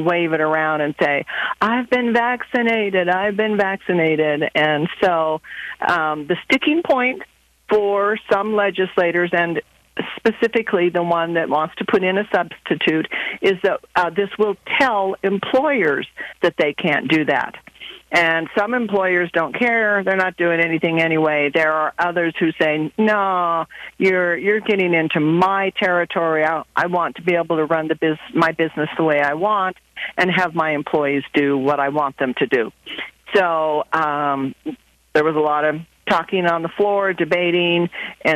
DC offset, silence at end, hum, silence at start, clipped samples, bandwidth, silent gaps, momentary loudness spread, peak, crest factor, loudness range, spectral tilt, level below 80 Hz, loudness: under 0.1%; 0 s; none; 0 s; under 0.1%; 13.5 kHz; none; 5 LU; -4 dBFS; 16 dB; 2 LU; -6.5 dB/octave; -60 dBFS; -18 LUFS